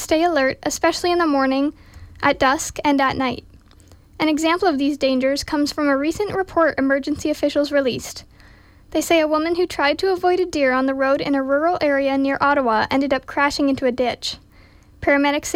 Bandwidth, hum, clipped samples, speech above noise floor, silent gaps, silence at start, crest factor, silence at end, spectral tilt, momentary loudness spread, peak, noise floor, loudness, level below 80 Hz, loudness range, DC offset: 16 kHz; none; under 0.1%; 30 dB; none; 0 s; 14 dB; 0 s; -3.5 dB/octave; 6 LU; -6 dBFS; -48 dBFS; -19 LUFS; -48 dBFS; 2 LU; under 0.1%